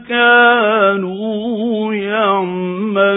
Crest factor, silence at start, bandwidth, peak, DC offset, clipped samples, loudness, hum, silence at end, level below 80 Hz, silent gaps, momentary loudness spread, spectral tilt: 14 dB; 0 s; 4 kHz; 0 dBFS; under 0.1%; under 0.1%; -14 LUFS; none; 0 s; -62 dBFS; none; 11 LU; -10.5 dB/octave